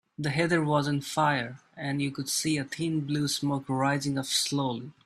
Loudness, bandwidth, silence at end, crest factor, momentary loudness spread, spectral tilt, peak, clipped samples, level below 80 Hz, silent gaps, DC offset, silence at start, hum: -28 LUFS; 15 kHz; 0.15 s; 18 dB; 5 LU; -4.5 dB/octave; -10 dBFS; under 0.1%; -66 dBFS; none; under 0.1%; 0.2 s; none